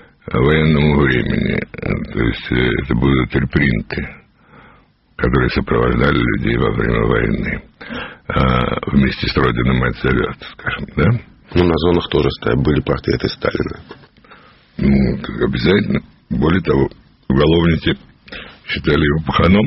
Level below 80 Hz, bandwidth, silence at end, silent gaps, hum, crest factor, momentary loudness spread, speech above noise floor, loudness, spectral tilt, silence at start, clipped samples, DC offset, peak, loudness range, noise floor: -28 dBFS; 5.8 kHz; 0 s; none; none; 16 dB; 11 LU; 35 dB; -17 LUFS; -5.5 dB/octave; 0.25 s; under 0.1%; under 0.1%; 0 dBFS; 2 LU; -50 dBFS